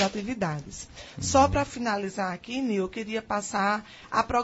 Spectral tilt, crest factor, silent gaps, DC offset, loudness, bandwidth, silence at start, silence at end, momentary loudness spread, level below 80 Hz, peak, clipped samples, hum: -4.5 dB/octave; 20 dB; none; under 0.1%; -28 LUFS; 8.2 kHz; 0 s; 0 s; 11 LU; -48 dBFS; -8 dBFS; under 0.1%; none